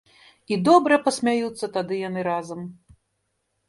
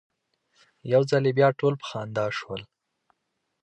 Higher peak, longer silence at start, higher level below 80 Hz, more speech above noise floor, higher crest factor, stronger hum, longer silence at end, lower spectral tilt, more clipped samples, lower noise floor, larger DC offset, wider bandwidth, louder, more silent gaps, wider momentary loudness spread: first, -4 dBFS vs -8 dBFS; second, 0.5 s vs 0.85 s; about the same, -66 dBFS vs -66 dBFS; about the same, 53 dB vs 54 dB; about the same, 20 dB vs 20 dB; neither; about the same, 0.95 s vs 1 s; second, -5 dB/octave vs -6.5 dB/octave; neither; second, -74 dBFS vs -78 dBFS; neither; first, 11.5 kHz vs 9 kHz; first, -22 LUFS vs -25 LUFS; neither; about the same, 16 LU vs 16 LU